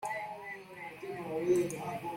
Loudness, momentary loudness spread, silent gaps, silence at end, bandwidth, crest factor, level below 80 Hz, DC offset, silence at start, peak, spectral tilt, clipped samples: -36 LUFS; 14 LU; none; 0 s; 16.5 kHz; 18 dB; -72 dBFS; under 0.1%; 0 s; -18 dBFS; -5.5 dB/octave; under 0.1%